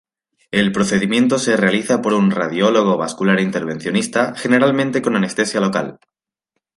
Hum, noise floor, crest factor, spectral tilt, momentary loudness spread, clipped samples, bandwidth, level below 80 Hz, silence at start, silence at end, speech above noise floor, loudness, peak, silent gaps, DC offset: none; -76 dBFS; 16 dB; -5 dB/octave; 5 LU; under 0.1%; 11.5 kHz; -58 dBFS; 0.55 s; 0.8 s; 60 dB; -17 LUFS; 0 dBFS; none; under 0.1%